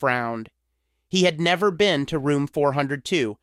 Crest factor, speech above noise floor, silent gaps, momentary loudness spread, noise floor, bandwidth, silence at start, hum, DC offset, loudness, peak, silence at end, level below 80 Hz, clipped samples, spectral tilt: 16 dB; 52 dB; none; 6 LU; -74 dBFS; 14.5 kHz; 0 s; none; under 0.1%; -22 LUFS; -6 dBFS; 0.1 s; -56 dBFS; under 0.1%; -5 dB/octave